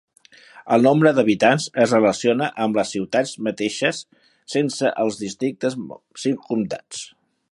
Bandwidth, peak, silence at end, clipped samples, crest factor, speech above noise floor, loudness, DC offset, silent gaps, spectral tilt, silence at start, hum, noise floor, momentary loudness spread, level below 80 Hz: 11.5 kHz; -2 dBFS; 0.45 s; under 0.1%; 18 dB; 27 dB; -20 LUFS; under 0.1%; none; -5 dB/octave; 0.55 s; none; -47 dBFS; 13 LU; -64 dBFS